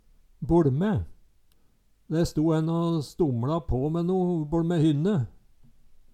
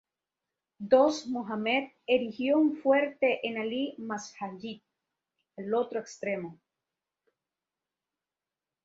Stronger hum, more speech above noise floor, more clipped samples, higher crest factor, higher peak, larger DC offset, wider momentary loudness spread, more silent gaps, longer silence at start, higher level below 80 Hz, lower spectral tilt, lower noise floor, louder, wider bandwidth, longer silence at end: neither; second, 37 dB vs over 61 dB; neither; second, 16 dB vs 22 dB; about the same, -10 dBFS vs -10 dBFS; neither; second, 7 LU vs 17 LU; neither; second, 0.4 s vs 0.8 s; first, -44 dBFS vs -76 dBFS; first, -8.5 dB/octave vs -4.5 dB/octave; second, -62 dBFS vs under -90 dBFS; first, -26 LUFS vs -29 LUFS; first, 13.5 kHz vs 7.8 kHz; second, 0.2 s vs 2.3 s